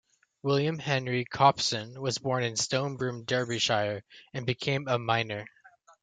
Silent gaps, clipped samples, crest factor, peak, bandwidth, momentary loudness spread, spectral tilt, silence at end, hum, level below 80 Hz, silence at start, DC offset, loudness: none; under 0.1%; 22 dB; -8 dBFS; 9.4 kHz; 11 LU; -4 dB/octave; 0.35 s; none; -68 dBFS; 0.45 s; under 0.1%; -29 LUFS